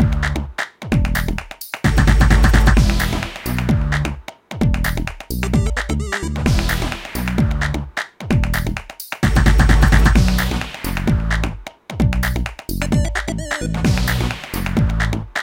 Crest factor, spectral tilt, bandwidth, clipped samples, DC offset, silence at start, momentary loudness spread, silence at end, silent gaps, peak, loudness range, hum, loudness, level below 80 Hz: 16 dB; -5.5 dB/octave; 17 kHz; under 0.1%; under 0.1%; 0 s; 12 LU; 0 s; none; 0 dBFS; 4 LU; none; -19 LUFS; -20 dBFS